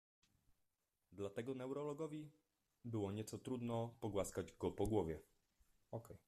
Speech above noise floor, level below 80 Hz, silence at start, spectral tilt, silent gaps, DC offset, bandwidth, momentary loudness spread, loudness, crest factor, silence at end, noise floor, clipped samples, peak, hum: 42 dB; -66 dBFS; 1.1 s; -6.5 dB/octave; none; under 0.1%; 14 kHz; 13 LU; -46 LUFS; 20 dB; 0.1 s; -87 dBFS; under 0.1%; -26 dBFS; none